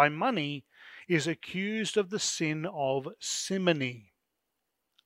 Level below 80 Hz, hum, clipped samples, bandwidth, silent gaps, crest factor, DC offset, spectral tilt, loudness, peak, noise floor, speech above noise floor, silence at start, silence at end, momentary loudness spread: -76 dBFS; none; under 0.1%; 16 kHz; none; 24 dB; under 0.1%; -4 dB/octave; -31 LUFS; -6 dBFS; -83 dBFS; 52 dB; 0 s; 1.05 s; 9 LU